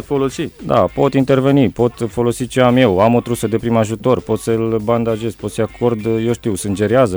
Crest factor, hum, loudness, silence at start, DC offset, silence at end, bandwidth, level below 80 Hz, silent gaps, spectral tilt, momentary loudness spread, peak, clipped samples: 14 dB; none; -16 LUFS; 0 s; under 0.1%; 0 s; over 20 kHz; -42 dBFS; none; -6.5 dB/octave; 8 LU; -2 dBFS; under 0.1%